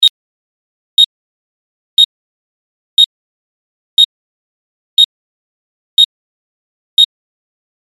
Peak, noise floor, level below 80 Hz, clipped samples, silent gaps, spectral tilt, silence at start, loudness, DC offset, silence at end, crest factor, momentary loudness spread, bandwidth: 0 dBFS; under -90 dBFS; -58 dBFS; under 0.1%; 0.10-0.97 s, 1.06-1.97 s, 2.05-2.97 s, 3.06-3.97 s, 4.05-4.97 s, 5.05-5.97 s, 6.05-6.97 s; 4 dB/octave; 0 s; -11 LUFS; under 0.1%; 0.85 s; 16 dB; 5 LU; 15.5 kHz